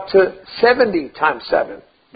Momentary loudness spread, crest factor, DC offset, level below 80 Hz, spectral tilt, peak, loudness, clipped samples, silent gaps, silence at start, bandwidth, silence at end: 6 LU; 16 dB; under 0.1%; -52 dBFS; -10 dB/octave; 0 dBFS; -17 LUFS; under 0.1%; none; 0 s; 5 kHz; 0.35 s